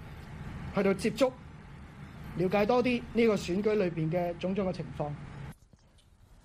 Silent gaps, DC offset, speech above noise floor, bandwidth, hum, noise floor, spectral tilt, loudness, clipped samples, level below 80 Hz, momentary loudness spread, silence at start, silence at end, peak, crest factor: none; under 0.1%; 31 dB; 15 kHz; none; -60 dBFS; -6.5 dB/octave; -30 LUFS; under 0.1%; -52 dBFS; 21 LU; 0 s; 0.1 s; -14 dBFS; 18 dB